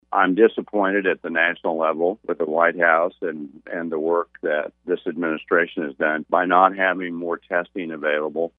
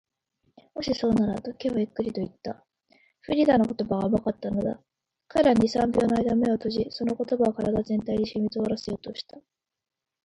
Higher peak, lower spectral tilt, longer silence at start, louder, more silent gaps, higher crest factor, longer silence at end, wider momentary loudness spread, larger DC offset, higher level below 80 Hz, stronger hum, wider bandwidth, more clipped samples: first, 0 dBFS vs -8 dBFS; first, -8.5 dB/octave vs -7 dB/octave; second, 0.1 s vs 0.75 s; first, -21 LUFS vs -26 LUFS; neither; about the same, 22 dB vs 20 dB; second, 0.1 s vs 0.85 s; second, 10 LU vs 13 LU; neither; second, -68 dBFS vs -52 dBFS; neither; second, 3.9 kHz vs 10.5 kHz; neither